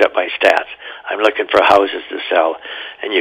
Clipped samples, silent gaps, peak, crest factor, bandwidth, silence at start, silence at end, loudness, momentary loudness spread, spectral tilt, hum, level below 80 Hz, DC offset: under 0.1%; none; 0 dBFS; 16 dB; 15 kHz; 0 s; 0 s; -15 LUFS; 15 LU; -3.5 dB/octave; none; -54 dBFS; under 0.1%